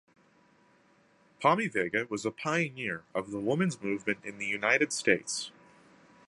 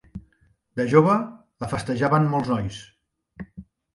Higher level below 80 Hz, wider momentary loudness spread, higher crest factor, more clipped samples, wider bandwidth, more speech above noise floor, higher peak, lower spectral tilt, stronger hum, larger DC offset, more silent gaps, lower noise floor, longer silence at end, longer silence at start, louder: second, -72 dBFS vs -52 dBFS; second, 10 LU vs 24 LU; about the same, 24 dB vs 20 dB; neither; about the same, 11.5 kHz vs 11.5 kHz; second, 34 dB vs 42 dB; second, -8 dBFS vs -4 dBFS; second, -4 dB/octave vs -7.5 dB/octave; neither; neither; neither; about the same, -65 dBFS vs -63 dBFS; first, 0.8 s vs 0.35 s; first, 1.4 s vs 0.15 s; second, -30 LUFS vs -22 LUFS